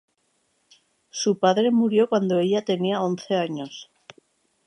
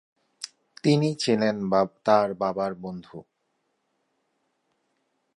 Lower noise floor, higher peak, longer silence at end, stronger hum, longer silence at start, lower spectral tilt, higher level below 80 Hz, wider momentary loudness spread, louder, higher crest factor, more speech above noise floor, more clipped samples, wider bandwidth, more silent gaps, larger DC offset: second, -70 dBFS vs -75 dBFS; about the same, -6 dBFS vs -6 dBFS; second, 0.85 s vs 2.15 s; neither; first, 1.15 s vs 0.4 s; about the same, -5.5 dB/octave vs -6 dB/octave; second, -76 dBFS vs -66 dBFS; second, 14 LU vs 18 LU; about the same, -22 LUFS vs -24 LUFS; about the same, 18 dB vs 22 dB; about the same, 48 dB vs 51 dB; neither; about the same, 11 kHz vs 11.5 kHz; neither; neither